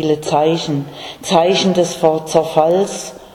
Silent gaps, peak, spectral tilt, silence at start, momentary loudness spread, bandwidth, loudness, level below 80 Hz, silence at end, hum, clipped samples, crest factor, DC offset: none; 0 dBFS; -5 dB/octave; 0 s; 10 LU; 18 kHz; -15 LUFS; -52 dBFS; 0.05 s; none; under 0.1%; 16 dB; under 0.1%